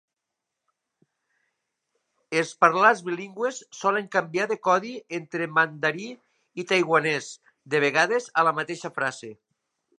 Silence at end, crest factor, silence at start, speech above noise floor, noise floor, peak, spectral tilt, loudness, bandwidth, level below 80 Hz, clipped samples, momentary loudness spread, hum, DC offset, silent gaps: 0.65 s; 24 dB; 2.3 s; 60 dB; -84 dBFS; -2 dBFS; -4 dB/octave; -24 LUFS; 11.5 kHz; -80 dBFS; under 0.1%; 14 LU; none; under 0.1%; none